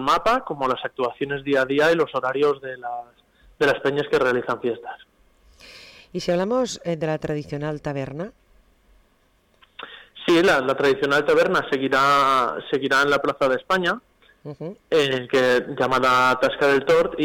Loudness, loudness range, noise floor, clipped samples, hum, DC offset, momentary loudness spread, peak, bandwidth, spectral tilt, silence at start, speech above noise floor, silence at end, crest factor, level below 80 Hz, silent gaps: -21 LUFS; 8 LU; -62 dBFS; under 0.1%; none; under 0.1%; 16 LU; -12 dBFS; 18 kHz; -5 dB/octave; 0 s; 41 dB; 0 s; 10 dB; -54 dBFS; none